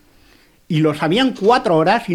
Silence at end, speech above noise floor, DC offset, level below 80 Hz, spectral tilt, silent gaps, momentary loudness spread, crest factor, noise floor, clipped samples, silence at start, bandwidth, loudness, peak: 0 s; 36 dB; under 0.1%; -54 dBFS; -6.5 dB/octave; none; 4 LU; 16 dB; -51 dBFS; under 0.1%; 0.7 s; 13.5 kHz; -16 LUFS; -2 dBFS